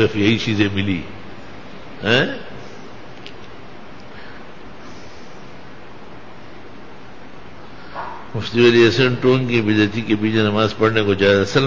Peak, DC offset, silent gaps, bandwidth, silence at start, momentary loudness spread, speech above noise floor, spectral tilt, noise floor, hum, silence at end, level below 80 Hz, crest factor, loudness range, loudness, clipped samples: -2 dBFS; 2%; none; 7.6 kHz; 0 s; 25 LU; 23 dB; -6 dB/octave; -40 dBFS; none; 0 s; -46 dBFS; 18 dB; 22 LU; -17 LUFS; under 0.1%